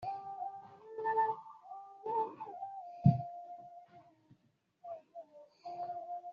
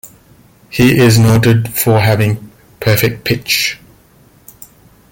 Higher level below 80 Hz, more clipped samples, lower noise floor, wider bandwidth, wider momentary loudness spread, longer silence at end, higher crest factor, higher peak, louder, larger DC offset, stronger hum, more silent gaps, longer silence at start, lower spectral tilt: second, -72 dBFS vs -40 dBFS; neither; first, -75 dBFS vs -46 dBFS; second, 5.2 kHz vs 17 kHz; first, 22 LU vs 11 LU; second, 0 s vs 1.35 s; first, 26 dB vs 14 dB; second, -14 dBFS vs 0 dBFS; second, -38 LUFS vs -12 LUFS; neither; neither; neither; about the same, 0 s vs 0.05 s; first, -9 dB/octave vs -5.5 dB/octave